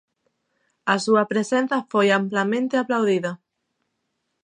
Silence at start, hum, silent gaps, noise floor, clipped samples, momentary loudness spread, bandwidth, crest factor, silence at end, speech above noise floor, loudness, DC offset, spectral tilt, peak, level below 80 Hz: 0.85 s; none; none; -76 dBFS; under 0.1%; 7 LU; 10.5 kHz; 20 dB; 1.1 s; 55 dB; -21 LUFS; under 0.1%; -5 dB/octave; -4 dBFS; -78 dBFS